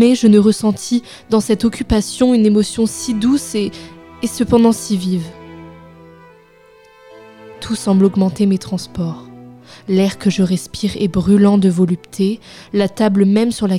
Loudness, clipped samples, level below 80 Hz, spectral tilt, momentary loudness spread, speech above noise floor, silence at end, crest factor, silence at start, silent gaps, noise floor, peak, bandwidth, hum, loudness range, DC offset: -15 LUFS; under 0.1%; -40 dBFS; -6 dB/octave; 13 LU; 32 dB; 0 s; 16 dB; 0 s; none; -46 dBFS; 0 dBFS; 14.5 kHz; none; 5 LU; under 0.1%